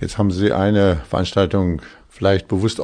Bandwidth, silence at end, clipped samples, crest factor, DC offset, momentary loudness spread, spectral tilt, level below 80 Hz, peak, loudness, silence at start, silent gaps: 10 kHz; 0 s; under 0.1%; 16 dB; under 0.1%; 6 LU; -7 dB/octave; -38 dBFS; -2 dBFS; -18 LUFS; 0 s; none